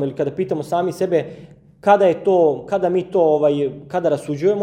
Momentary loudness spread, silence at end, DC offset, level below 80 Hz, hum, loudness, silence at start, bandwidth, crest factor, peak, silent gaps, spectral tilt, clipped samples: 8 LU; 0 s; under 0.1%; -60 dBFS; none; -18 LUFS; 0 s; 14.5 kHz; 16 dB; -2 dBFS; none; -7 dB/octave; under 0.1%